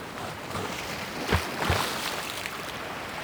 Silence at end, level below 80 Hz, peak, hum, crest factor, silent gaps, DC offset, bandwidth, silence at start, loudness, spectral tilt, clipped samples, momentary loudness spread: 0 s; -46 dBFS; -8 dBFS; none; 24 dB; none; under 0.1%; over 20 kHz; 0 s; -30 LUFS; -3.5 dB/octave; under 0.1%; 8 LU